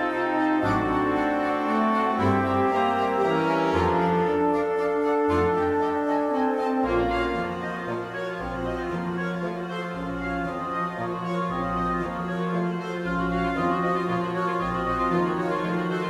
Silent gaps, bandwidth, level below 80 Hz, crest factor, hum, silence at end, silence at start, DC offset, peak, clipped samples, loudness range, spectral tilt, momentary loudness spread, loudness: none; 12 kHz; -46 dBFS; 16 dB; none; 0 s; 0 s; under 0.1%; -10 dBFS; under 0.1%; 6 LU; -7.5 dB/octave; 7 LU; -25 LUFS